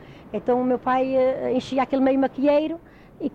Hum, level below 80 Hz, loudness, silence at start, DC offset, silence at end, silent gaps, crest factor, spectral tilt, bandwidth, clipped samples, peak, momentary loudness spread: none; -56 dBFS; -22 LUFS; 0 s; under 0.1%; 0 s; none; 12 dB; -6.5 dB/octave; 8.2 kHz; under 0.1%; -10 dBFS; 11 LU